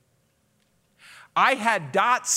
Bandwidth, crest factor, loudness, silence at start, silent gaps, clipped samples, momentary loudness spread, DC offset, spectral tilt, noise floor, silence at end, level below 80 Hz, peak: 16 kHz; 20 dB; -22 LUFS; 1.35 s; none; under 0.1%; 4 LU; under 0.1%; -1.5 dB/octave; -67 dBFS; 0 s; -80 dBFS; -6 dBFS